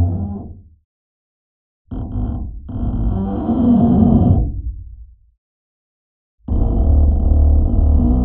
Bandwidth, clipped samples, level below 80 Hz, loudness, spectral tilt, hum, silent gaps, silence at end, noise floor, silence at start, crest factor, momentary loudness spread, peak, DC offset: 3.3 kHz; under 0.1%; -20 dBFS; -16 LUFS; -12.5 dB/octave; none; 0.85-1.85 s, 5.38-6.38 s; 0 s; -39 dBFS; 0 s; 16 dB; 18 LU; 0 dBFS; under 0.1%